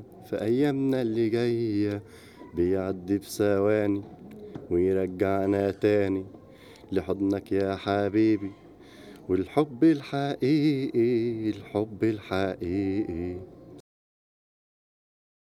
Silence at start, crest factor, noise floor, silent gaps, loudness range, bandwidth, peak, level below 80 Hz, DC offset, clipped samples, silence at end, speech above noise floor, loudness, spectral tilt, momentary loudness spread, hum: 0 s; 20 dB; -50 dBFS; none; 4 LU; 15 kHz; -8 dBFS; -60 dBFS; under 0.1%; under 0.1%; 1.6 s; 24 dB; -27 LUFS; -7.5 dB/octave; 11 LU; none